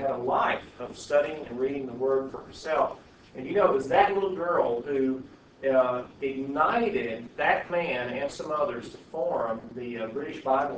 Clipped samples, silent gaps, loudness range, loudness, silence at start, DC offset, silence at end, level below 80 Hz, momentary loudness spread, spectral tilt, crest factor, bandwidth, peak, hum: under 0.1%; none; 4 LU; -28 LUFS; 0 s; under 0.1%; 0 s; -60 dBFS; 12 LU; -5.5 dB/octave; 20 dB; 8 kHz; -6 dBFS; none